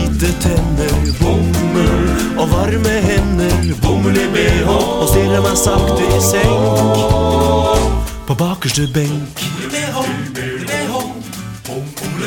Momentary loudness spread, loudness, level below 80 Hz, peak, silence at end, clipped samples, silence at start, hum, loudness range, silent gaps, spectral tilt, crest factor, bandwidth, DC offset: 9 LU; -15 LUFS; -22 dBFS; 0 dBFS; 0 s; under 0.1%; 0 s; none; 6 LU; none; -5 dB/octave; 14 dB; 17.5 kHz; under 0.1%